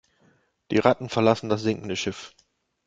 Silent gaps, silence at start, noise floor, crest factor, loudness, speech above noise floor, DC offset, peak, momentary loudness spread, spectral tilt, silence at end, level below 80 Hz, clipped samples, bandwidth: none; 0.7 s; -64 dBFS; 24 dB; -24 LUFS; 40 dB; under 0.1%; -2 dBFS; 12 LU; -5.5 dB/octave; 0.6 s; -60 dBFS; under 0.1%; 8.8 kHz